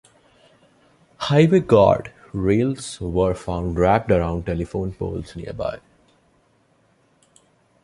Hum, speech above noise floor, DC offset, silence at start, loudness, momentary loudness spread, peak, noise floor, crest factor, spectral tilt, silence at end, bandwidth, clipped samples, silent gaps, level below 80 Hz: none; 41 dB; under 0.1%; 1.2 s; -20 LUFS; 14 LU; -2 dBFS; -61 dBFS; 20 dB; -7 dB/octave; 2.05 s; 11.5 kHz; under 0.1%; none; -40 dBFS